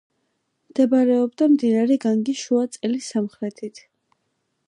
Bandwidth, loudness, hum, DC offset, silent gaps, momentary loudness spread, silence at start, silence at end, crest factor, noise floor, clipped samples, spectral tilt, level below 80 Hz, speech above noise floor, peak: 11 kHz; -21 LUFS; none; under 0.1%; none; 13 LU; 0.75 s; 0.9 s; 16 dB; -73 dBFS; under 0.1%; -5.5 dB/octave; -76 dBFS; 53 dB; -6 dBFS